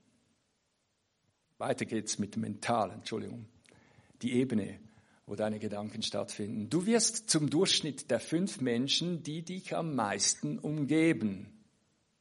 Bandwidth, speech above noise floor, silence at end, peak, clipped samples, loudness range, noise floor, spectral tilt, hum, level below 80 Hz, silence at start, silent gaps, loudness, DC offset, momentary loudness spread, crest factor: 11.5 kHz; 46 dB; 0.7 s; -14 dBFS; under 0.1%; 7 LU; -78 dBFS; -4 dB/octave; none; -76 dBFS; 1.6 s; none; -32 LUFS; under 0.1%; 12 LU; 20 dB